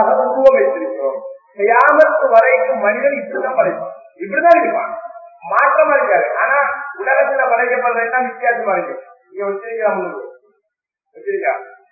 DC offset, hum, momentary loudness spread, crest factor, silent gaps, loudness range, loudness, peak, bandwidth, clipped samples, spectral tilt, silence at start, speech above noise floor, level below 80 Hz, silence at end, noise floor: under 0.1%; none; 17 LU; 16 dB; none; 7 LU; -15 LUFS; 0 dBFS; 6 kHz; 0.1%; -6.5 dB/octave; 0 s; 61 dB; -64 dBFS; 0.2 s; -75 dBFS